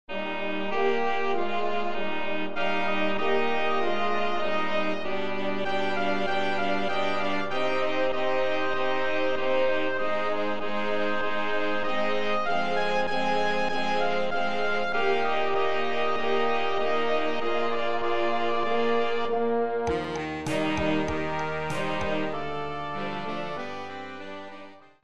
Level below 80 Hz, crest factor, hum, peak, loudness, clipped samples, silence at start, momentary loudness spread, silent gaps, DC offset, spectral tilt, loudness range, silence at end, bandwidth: -54 dBFS; 14 dB; none; -12 dBFS; -28 LUFS; under 0.1%; 0.05 s; 6 LU; none; 4%; -5 dB/octave; 2 LU; 0 s; 12 kHz